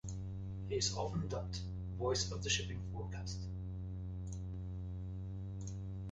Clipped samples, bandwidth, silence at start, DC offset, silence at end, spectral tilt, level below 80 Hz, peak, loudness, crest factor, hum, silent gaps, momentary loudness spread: under 0.1%; 8.2 kHz; 0.05 s; under 0.1%; 0 s; -4 dB/octave; -50 dBFS; -22 dBFS; -41 LUFS; 20 dB; none; none; 9 LU